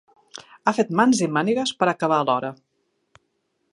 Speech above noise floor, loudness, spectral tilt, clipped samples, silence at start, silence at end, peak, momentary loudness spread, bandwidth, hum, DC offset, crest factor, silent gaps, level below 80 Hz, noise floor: 52 dB; -21 LUFS; -4.5 dB/octave; under 0.1%; 0.35 s; 1.2 s; -4 dBFS; 20 LU; 11.5 kHz; none; under 0.1%; 20 dB; none; -70 dBFS; -72 dBFS